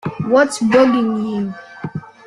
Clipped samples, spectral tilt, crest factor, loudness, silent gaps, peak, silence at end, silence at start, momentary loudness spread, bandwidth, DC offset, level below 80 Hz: under 0.1%; -6 dB/octave; 16 dB; -15 LUFS; none; -2 dBFS; 0.25 s; 0.05 s; 16 LU; 12 kHz; under 0.1%; -56 dBFS